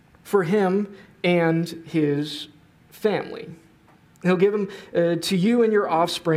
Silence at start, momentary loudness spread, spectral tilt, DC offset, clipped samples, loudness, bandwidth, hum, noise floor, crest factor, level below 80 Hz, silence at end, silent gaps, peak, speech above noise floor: 0.25 s; 13 LU; -6 dB/octave; under 0.1%; under 0.1%; -22 LUFS; 16 kHz; none; -54 dBFS; 16 dB; -66 dBFS; 0 s; none; -6 dBFS; 33 dB